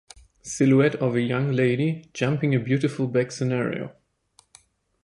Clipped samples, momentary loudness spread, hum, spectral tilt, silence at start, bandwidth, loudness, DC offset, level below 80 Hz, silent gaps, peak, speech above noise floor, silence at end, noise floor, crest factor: under 0.1%; 11 LU; none; -6.5 dB/octave; 0.45 s; 11.5 kHz; -23 LUFS; under 0.1%; -60 dBFS; none; -8 dBFS; 39 dB; 1.1 s; -62 dBFS; 16 dB